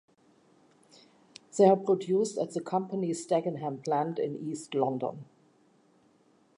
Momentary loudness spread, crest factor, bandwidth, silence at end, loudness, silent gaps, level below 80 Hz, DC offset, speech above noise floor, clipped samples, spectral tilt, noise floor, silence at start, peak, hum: 12 LU; 22 dB; 11 kHz; 1.35 s; -29 LUFS; none; -84 dBFS; under 0.1%; 37 dB; under 0.1%; -6.5 dB/octave; -65 dBFS; 1.55 s; -10 dBFS; none